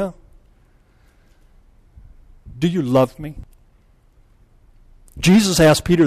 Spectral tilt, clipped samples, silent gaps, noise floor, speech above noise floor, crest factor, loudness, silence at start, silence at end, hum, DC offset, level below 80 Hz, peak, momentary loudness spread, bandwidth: -5.5 dB/octave; under 0.1%; none; -54 dBFS; 39 dB; 16 dB; -16 LUFS; 0 s; 0 s; none; under 0.1%; -42 dBFS; -4 dBFS; 21 LU; 14 kHz